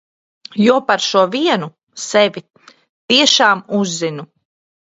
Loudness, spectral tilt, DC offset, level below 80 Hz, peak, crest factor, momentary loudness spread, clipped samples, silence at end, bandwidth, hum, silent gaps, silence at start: -14 LUFS; -3 dB/octave; under 0.1%; -64 dBFS; 0 dBFS; 16 dB; 18 LU; under 0.1%; 0.6 s; 8 kHz; none; 1.83-1.87 s, 2.89-3.08 s; 0.55 s